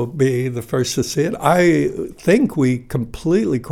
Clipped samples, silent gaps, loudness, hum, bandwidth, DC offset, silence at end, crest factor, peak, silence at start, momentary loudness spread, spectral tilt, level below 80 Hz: under 0.1%; none; -18 LUFS; none; 17 kHz; under 0.1%; 0 s; 16 dB; -2 dBFS; 0 s; 8 LU; -6 dB/octave; -44 dBFS